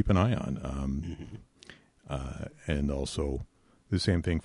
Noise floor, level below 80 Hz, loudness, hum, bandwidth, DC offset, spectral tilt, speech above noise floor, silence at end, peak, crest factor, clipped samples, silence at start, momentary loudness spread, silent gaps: -55 dBFS; -40 dBFS; -32 LUFS; none; 11.5 kHz; under 0.1%; -6.5 dB/octave; 25 dB; 0.05 s; -12 dBFS; 18 dB; under 0.1%; 0 s; 21 LU; none